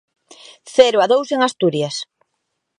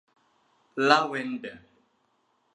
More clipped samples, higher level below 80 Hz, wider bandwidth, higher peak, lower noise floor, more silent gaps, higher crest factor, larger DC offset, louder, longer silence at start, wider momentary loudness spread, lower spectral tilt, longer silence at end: neither; first, -64 dBFS vs -76 dBFS; about the same, 11 kHz vs 10.5 kHz; first, 0 dBFS vs -4 dBFS; about the same, -74 dBFS vs -71 dBFS; neither; second, 18 dB vs 26 dB; neither; first, -16 LUFS vs -25 LUFS; about the same, 0.65 s vs 0.75 s; second, 13 LU vs 18 LU; about the same, -4 dB/octave vs -4 dB/octave; second, 0.75 s vs 0.95 s